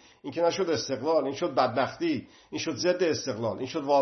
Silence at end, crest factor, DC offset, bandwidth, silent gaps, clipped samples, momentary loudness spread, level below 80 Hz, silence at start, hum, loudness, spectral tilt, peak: 0 s; 18 dB; under 0.1%; 6.4 kHz; none; under 0.1%; 8 LU; -70 dBFS; 0.25 s; none; -28 LUFS; -4.5 dB/octave; -10 dBFS